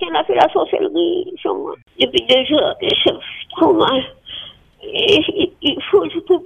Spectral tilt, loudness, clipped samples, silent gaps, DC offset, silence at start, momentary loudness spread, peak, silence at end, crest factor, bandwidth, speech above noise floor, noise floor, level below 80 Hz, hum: -5 dB/octave; -16 LUFS; under 0.1%; none; under 0.1%; 0 s; 15 LU; 0 dBFS; 0 s; 16 dB; 9.8 kHz; 20 dB; -36 dBFS; -52 dBFS; none